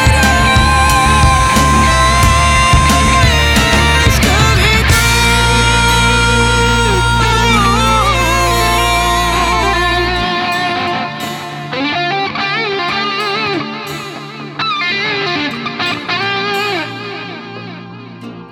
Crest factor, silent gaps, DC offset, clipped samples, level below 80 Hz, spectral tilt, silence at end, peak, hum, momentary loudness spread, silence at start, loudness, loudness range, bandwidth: 12 dB; none; under 0.1%; under 0.1%; -20 dBFS; -3.5 dB/octave; 0 s; 0 dBFS; none; 14 LU; 0 s; -11 LUFS; 7 LU; 18 kHz